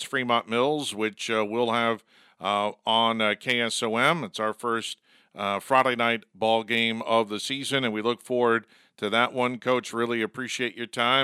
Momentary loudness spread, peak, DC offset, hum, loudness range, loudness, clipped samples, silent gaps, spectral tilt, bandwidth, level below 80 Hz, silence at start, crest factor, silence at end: 7 LU; -4 dBFS; under 0.1%; none; 1 LU; -25 LUFS; under 0.1%; none; -3.5 dB/octave; 15.5 kHz; -78 dBFS; 0 s; 22 dB; 0 s